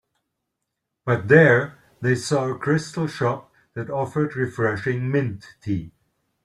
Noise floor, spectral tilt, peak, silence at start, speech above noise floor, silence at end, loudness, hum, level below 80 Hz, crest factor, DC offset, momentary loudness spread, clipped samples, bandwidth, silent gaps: -80 dBFS; -6.5 dB/octave; -2 dBFS; 1.05 s; 59 dB; 0.55 s; -22 LUFS; none; -58 dBFS; 22 dB; under 0.1%; 18 LU; under 0.1%; 12 kHz; none